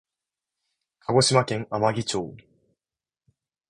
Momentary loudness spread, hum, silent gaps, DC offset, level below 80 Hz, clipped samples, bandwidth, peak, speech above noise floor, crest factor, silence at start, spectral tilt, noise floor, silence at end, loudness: 15 LU; none; none; under 0.1%; -60 dBFS; under 0.1%; 11.5 kHz; -4 dBFS; over 67 dB; 24 dB; 1.1 s; -4.5 dB/octave; under -90 dBFS; 1.3 s; -23 LUFS